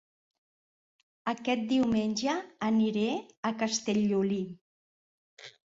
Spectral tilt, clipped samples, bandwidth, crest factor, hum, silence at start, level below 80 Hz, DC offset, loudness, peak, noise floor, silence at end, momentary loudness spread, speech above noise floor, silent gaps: -5 dB/octave; under 0.1%; 7.8 kHz; 16 dB; none; 1.25 s; -66 dBFS; under 0.1%; -30 LUFS; -16 dBFS; under -90 dBFS; 0.2 s; 9 LU; over 61 dB; 3.37-3.43 s, 4.61-5.37 s